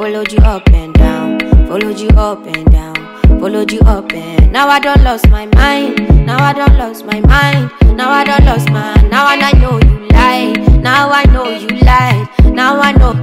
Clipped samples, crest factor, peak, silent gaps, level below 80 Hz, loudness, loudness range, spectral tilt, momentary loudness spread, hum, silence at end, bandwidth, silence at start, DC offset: 3%; 8 dB; 0 dBFS; none; -10 dBFS; -10 LUFS; 2 LU; -6.5 dB/octave; 5 LU; none; 0 s; 13.5 kHz; 0 s; 0.3%